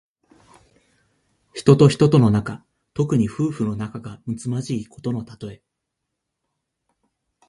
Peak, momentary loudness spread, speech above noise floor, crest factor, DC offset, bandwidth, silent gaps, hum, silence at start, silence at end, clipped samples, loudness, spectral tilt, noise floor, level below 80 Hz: 0 dBFS; 22 LU; 60 dB; 22 dB; under 0.1%; 11.5 kHz; none; none; 1.55 s; 1.95 s; under 0.1%; -20 LUFS; -7.5 dB/octave; -80 dBFS; -52 dBFS